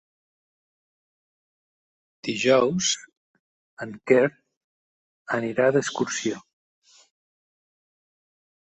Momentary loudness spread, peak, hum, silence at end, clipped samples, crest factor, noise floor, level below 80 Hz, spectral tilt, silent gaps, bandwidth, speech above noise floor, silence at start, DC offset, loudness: 16 LU; -4 dBFS; none; 2.25 s; under 0.1%; 24 dB; under -90 dBFS; -68 dBFS; -3.5 dB/octave; 3.17-3.77 s, 4.57-5.25 s; 8.4 kHz; over 67 dB; 2.25 s; under 0.1%; -23 LUFS